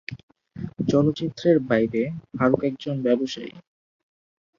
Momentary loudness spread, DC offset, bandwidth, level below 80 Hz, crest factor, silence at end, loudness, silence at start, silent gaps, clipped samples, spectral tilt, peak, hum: 16 LU; under 0.1%; 7.4 kHz; -58 dBFS; 20 dB; 1 s; -23 LUFS; 0.1 s; 0.23-0.28 s; under 0.1%; -7.5 dB/octave; -4 dBFS; none